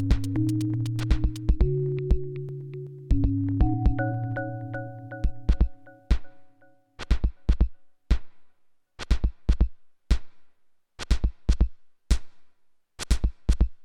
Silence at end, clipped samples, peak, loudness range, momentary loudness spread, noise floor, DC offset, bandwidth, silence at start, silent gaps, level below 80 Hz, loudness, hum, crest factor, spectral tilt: 0 s; under 0.1%; -8 dBFS; 4 LU; 10 LU; -58 dBFS; under 0.1%; 11 kHz; 0 s; none; -28 dBFS; -29 LUFS; none; 18 dB; -7 dB/octave